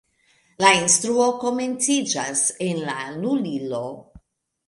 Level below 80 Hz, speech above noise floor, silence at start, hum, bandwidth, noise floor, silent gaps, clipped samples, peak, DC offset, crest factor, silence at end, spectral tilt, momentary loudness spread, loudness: -62 dBFS; 40 dB; 0.6 s; none; 11.5 kHz; -62 dBFS; none; under 0.1%; 0 dBFS; under 0.1%; 22 dB; 0.5 s; -2.5 dB/octave; 12 LU; -21 LUFS